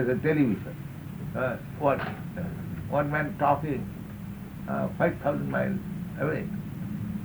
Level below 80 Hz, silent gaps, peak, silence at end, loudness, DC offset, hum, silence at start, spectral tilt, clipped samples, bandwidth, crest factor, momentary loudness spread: -50 dBFS; none; -10 dBFS; 0 s; -30 LUFS; under 0.1%; none; 0 s; -8.5 dB/octave; under 0.1%; over 20 kHz; 18 dB; 13 LU